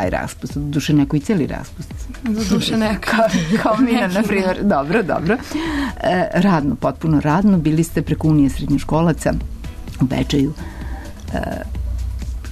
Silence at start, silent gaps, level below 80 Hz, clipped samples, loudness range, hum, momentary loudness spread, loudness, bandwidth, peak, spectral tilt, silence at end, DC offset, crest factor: 0 s; none; -30 dBFS; under 0.1%; 4 LU; none; 13 LU; -18 LUFS; 13.5 kHz; -6 dBFS; -6.5 dB/octave; 0 s; under 0.1%; 12 dB